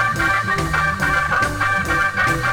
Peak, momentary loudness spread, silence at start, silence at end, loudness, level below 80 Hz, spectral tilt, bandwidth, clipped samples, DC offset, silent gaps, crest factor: -6 dBFS; 2 LU; 0 s; 0 s; -18 LUFS; -34 dBFS; -4 dB/octave; over 20 kHz; under 0.1%; under 0.1%; none; 12 dB